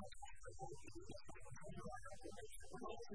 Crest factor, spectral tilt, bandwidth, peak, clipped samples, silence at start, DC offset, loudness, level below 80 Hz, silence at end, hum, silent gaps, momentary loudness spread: 16 dB; -4.5 dB/octave; 11 kHz; -36 dBFS; under 0.1%; 0 s; 0.2%; -56 LUFS; -64 dBFS; 0 s; none; none; 5 LU